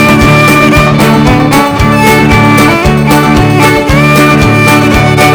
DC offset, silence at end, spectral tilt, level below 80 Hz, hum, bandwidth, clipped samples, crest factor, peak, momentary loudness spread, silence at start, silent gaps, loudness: under 0.1%; 0 s; -5.5 dB/octave; -20 dBFS; none; over 20 kHz; 5%; 4 dB; 0 dBFS; 2 LU; 0 s; none; -5 LUFS